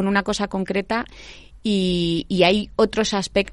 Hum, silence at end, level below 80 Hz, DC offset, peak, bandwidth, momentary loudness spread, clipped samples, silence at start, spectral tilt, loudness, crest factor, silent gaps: none; 0 s; -44 dBFS; under 0.1%; -2 dBFS; 11.5 kHz; 9 LU; under 0.1%; 0 s; -5 dB/octave; -21 LUFS; 18 dB; none